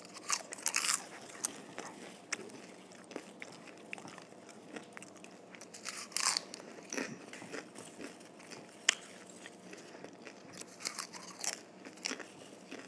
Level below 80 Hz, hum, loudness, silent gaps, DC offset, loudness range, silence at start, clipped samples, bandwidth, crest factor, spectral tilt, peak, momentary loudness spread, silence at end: under -90 dBFS; none; -39 LUFS; none; under 0.1%; 9 LU; 0 s; under 0.1%; 11 kHz; 34 dB; -0.5 dB/octave; -10 dBFS; 19 LU; 0 s